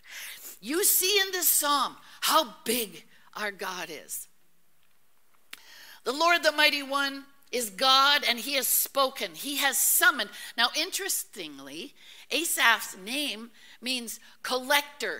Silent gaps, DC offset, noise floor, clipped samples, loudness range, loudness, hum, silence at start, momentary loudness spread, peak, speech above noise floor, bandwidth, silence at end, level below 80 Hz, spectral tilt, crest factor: none; 0.2%; -70 dBFS; under 0.1%; 8 LU; -25 LUFS; none; 0.05 s; 18 LU; -6 dBFS; 42 dB; 16.5 kHz; 0 s; -76 dBFS; 0.5 dB/octave; 24 dB